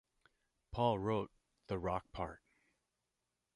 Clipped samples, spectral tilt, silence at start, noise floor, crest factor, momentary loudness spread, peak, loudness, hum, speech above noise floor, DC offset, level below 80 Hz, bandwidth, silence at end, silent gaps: under 0.1%; -8 dB/octave; 0.7 s; -88 dBFS; 22 dB; 12 LU; -20 dBFS; -40 LUFS; none; 50 dB; under 0.1%; -60 dBFS; 11 kHz; 1.2 s; none